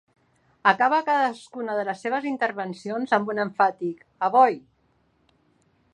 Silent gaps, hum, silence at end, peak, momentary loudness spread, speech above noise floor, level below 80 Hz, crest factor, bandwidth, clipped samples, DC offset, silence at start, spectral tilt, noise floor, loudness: none; none; 1.35 s; -2 dBFS; 13 LU; 43 dB; -76 dBFS; 22 dB; 9.8 kHz; under 0.1%; under 0.1%; 0.65 s; -5.5 dB/octave; -66 dBFS; -24 LUFS